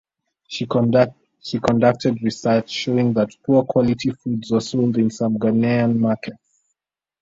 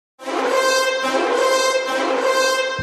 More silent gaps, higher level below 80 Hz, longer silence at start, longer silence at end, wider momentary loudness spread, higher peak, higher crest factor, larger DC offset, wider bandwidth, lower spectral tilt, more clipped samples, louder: neither; first, -54 dBFS vs -74 dBFS; first, 0.5 s vs 0.2 s; first, 0.85 s vs 0 s; first, 10 LU vs 4 LU; about the same, -2 dBFS vs -4 dBFS; about the same, 18 dB vs 14 dB; neither; second, 7.8 kHz vs 14.5 kHz; first, -7 dB/octave vs -1.5 dB/octave; neither; about the same, -20 LUFS vs -18 LUFS